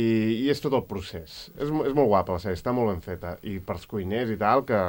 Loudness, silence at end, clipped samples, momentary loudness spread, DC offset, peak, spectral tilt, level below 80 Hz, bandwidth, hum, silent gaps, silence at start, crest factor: -26 LUFS; 0 s; under 0.1%; 13 LU; under 0.1%; -8 dBFS; -7 dB/octave; -52 dBFS; 17 kHz; none; none; 0 s; 18 dB